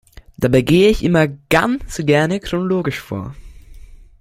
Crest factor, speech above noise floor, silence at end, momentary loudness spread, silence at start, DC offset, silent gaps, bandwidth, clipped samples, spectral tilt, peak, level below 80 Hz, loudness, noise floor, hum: 18 dB; 23 dB; 0.25 s; 13 LU; 0.4 s; under 0.1%; none; 16 kHz; under 0.1%; -6 dB/octave; 0 dBFS; -36 dBFS; -16 LUFS; -39 dBFS; none